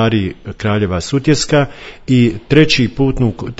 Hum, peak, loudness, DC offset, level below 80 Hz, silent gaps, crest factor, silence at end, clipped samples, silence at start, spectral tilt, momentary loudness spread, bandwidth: none; 0 dBFS; -14 LUFS; under 0.1%; -34 dBFS; none; 14 dB; 0.05 s; 0.1%; 0 s; -5.5 dB/octave; 10 LU; 8 kHz